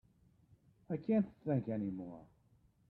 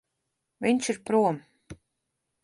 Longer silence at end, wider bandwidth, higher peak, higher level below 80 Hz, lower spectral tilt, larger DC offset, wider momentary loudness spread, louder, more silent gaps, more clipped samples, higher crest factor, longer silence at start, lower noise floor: about the same, 0.65 s vs 0.7 s; second, 4.4 kHz vs 11.5 kHz; second, -22 dBFS vs -10 dBFS; second, -72 dBFS vs -64 dBFS; first, -11.5 dB/octave vs -5 dB/octave; neither; first, 14 LU vs 6 LU; second, -38 LUFS vs -26 LUFS; neither; neither; about the same, 18 dB vs 18 dB; first, 0.9 s vs 0.6 s; second, -71 dBFS vs -81 dBFS